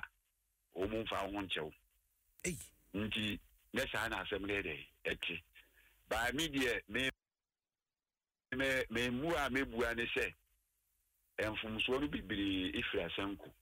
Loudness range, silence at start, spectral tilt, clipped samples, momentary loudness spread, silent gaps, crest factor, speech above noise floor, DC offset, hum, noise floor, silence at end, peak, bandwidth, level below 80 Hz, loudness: 3 LU; 0 s; -4 dB/octave; under 0.1%; 8 LU; none; 16 dB; over 51 dB; under 0.1%; none; under -90 dBFS; 0.1 s; -24 dBFS; 16 kHz; -58 dBFS; -38 LUFS